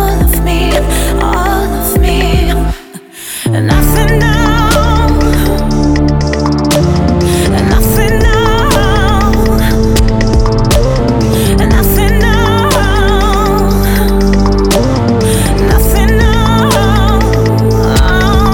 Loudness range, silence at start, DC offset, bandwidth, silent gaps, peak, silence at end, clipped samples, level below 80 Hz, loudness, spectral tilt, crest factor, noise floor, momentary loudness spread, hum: 2 LU; 0 s; under 0.1%; 19.5 kHz; none; 0 dBFS; 0 s; under 0.1%; -12 dBFS; -10 LUFS; -5.5 dB/octave; 8 dB; -29 dBFS; 3 LU; none